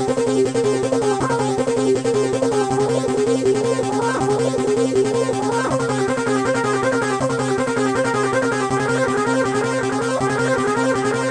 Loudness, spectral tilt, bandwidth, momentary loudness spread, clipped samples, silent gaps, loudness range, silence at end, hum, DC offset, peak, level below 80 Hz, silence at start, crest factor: -19 LUFS; -5 dB/octave; 10.5 kHz; 2 LU; under 0.1%; none; 1 LU; 0 s; none; under 0.1%; -6 dBFS; -50 dBFS; 0 s; 14 dB